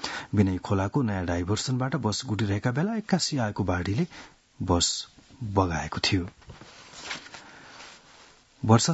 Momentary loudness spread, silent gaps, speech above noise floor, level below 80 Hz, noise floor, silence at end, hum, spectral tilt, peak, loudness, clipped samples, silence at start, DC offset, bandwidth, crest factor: 21 LU; none; 29 dB; -54 dBFS; -55 dBFS; 0 s; none; -5 dB/octave; -4 dBFS; -27 LUFS; under 0.1%; 0 s; under 0.1%; 8.2 kHz; 24 dB